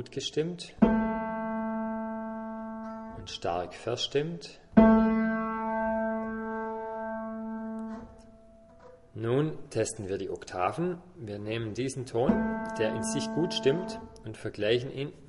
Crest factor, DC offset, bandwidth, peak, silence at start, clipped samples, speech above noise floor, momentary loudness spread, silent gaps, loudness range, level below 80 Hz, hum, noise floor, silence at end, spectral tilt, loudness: 26 dB; under 0.1%; 11.5 kHz; -6 dBFS; 0 s; under 0.1%; 24 dB; 14 LU; none; 8 LU; -52 dBFS; none; -54 dBFS; 0 s; -5.5 dB/octave; -30 LUFS